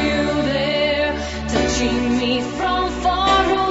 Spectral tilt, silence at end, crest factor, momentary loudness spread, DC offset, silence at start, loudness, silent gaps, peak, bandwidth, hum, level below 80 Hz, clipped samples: -4.5 dB/octave; 0 s; 16 dB; 5 LU; under 0.1%; 0 s; -19 LUFS; none; -4 dBFS; 8 kHz; none; -32 dBFS; under 0.1%